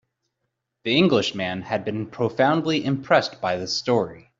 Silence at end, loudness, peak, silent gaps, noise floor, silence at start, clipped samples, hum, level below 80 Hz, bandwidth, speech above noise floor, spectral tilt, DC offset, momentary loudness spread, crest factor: 0.2 s; -22 LUFS; -4 dBFS; none; -79 dBFS; 0.85 s; under 0.1%; none; -62 dBFS; 7.8 kHz; 56 dB; -5.5 dB/octave; under 0.1%; 8 LU; 20 dB